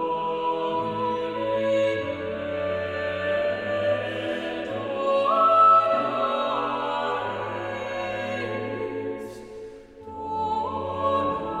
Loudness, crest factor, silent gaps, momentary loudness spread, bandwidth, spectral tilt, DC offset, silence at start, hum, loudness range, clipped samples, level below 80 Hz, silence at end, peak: -25 LUFS; 16 dB; none; 12 LU; 10 kHz; -6 dB/octave; under 0.1%; 0 s; none; 9 LU; under 0.1%; -58 dBFS; 0 s; -8 dBFS